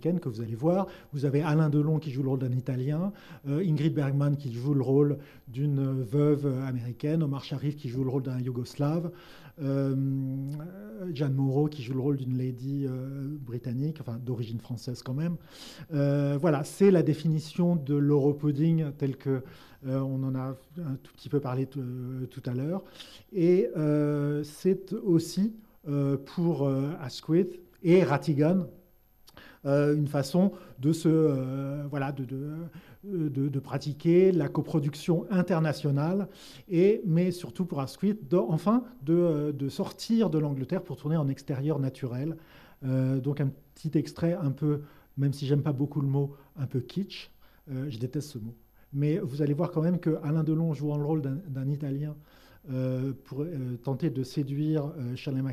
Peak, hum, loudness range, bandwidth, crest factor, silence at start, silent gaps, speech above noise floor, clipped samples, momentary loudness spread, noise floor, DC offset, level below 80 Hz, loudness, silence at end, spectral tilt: -12 dBFS; none; 6 LU; 13.5 kHz; 16 dB; 0 s; none; 31 dB; under 0.1%; 12 LU; -59 dBFS; under 0.1%; -64 dBFS; -29 LUFS; 0 s; -8.5 dB/octave